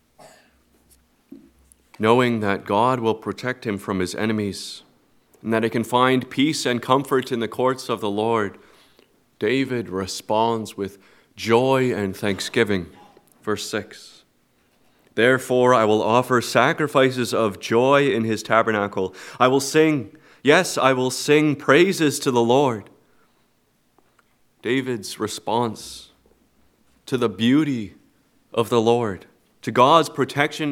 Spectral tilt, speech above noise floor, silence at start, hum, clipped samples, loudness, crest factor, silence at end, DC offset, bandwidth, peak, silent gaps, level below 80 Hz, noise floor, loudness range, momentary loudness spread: -5 dB/octave; 44 dB; 1.3 s; none; under 0.1%; -20 LUFS; 22 dB; 0 s; under 0.1%; 17 kHz; 0 dBFS; none; -64 dBFS; -64 dBFS; 7 LU; 13 LU